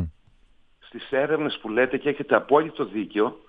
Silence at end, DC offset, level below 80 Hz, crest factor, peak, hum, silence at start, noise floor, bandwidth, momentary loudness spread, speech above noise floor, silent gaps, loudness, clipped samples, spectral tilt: 0.1 s; under 0.1%; -54 dBFS; 20 dB; -4 dBFS; none; 0 s; -57 dBFS; 4.9 kHz; 12 LU; 33 dB; none; -24 LUFS; under 0.1%; -8.5 dB/octave